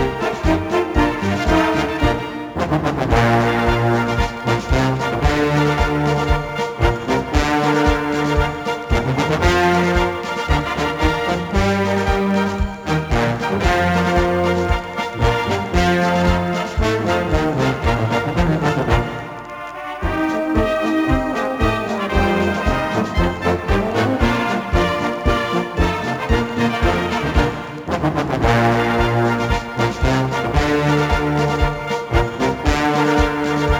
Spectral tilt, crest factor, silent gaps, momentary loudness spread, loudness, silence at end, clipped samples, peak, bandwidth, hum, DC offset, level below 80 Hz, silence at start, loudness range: -6 dB/octave; 16 dB; none; 5 LU; -18 LUFS; 0 s; under 0.1%; 0 dBFS; over 20 kHz; none; under 0.1%; -26 dBFS; 0 s; 2 LU